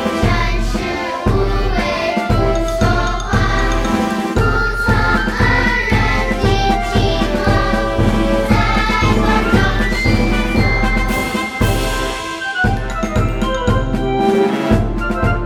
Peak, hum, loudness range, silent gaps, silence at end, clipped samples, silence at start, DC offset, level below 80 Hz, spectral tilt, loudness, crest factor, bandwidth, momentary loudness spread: 0 dBFS; none; 2 LU; none; 0 s; under 0.1%; 0 s; under 0.1%; -20 dBFS; -6 dB/octave; -16 LUFS; 14 dB; 16 kHz; 4 LU